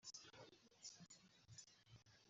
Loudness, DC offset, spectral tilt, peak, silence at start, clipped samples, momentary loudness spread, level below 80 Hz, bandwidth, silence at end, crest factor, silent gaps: -63 LUFS; under 0.1%; -2.5 dB/octave; -44 dBFS; 0 s; under 0.1%; 8 LU; -88 dBFS; 7.6 kHz; 0 s; 20 dB; none